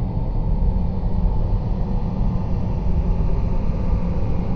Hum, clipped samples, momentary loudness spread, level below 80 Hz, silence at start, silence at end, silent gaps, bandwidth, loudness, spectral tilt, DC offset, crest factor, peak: none; under 0.1%; 2 LU; -22 dBFS; 0 s; 0 s; none; 5 kHz; -24 LUFS; -10.5 dB/octave; under 0.1%; 12 dB; -8 dBFS